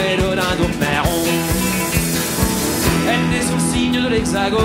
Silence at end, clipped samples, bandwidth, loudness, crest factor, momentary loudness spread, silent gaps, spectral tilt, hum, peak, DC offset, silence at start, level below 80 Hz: 0 s; under 0.1%; 16.5 kHz; -17 LUFS; 14 dB; 1 LU; none; -4 dB/octave; none; -2 dBFS; under 0.1%; 0 s; -30 dBFS